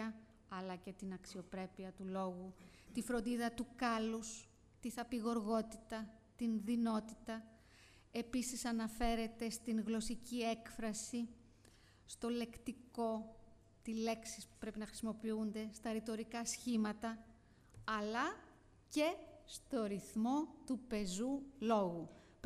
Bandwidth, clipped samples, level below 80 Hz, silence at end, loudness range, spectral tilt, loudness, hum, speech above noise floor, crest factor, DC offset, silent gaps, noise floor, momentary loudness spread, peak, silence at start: 15 kHz; under 0.1%; -62 dBFS; 0.1 s; 3 LU; -4.5 dB/octave; -42 LUFS; none; 24 dB; 20 dB; under 0.1%; none; -66 dBFS; 12 LU; -24 dBFS; 0 s